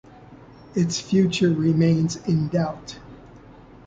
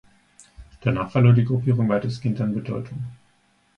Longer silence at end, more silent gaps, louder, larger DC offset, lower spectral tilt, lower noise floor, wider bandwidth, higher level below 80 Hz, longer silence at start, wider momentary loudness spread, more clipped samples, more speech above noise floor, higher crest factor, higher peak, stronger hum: second, 0.5 s vs 0.65 s; neither; about the same, -22 LUFS vs -22 LUFS; neither; second, -6.5 dB/octave vs -9 dB/octave; second, -46 dBFS vs -63 dBFS; about the same, 7.8 kHz vs 8.2 kHz; about the same, -52 dBFS vs -52 dBFS; second, 0.2 s vs 0.6 s; about the same, 15 LU vs 15 LU; neither; second, 25 dB vs 42 dB; about the same, 16 dB vs 18 dB; second, -8 dBFS vs -4 dBFS; neither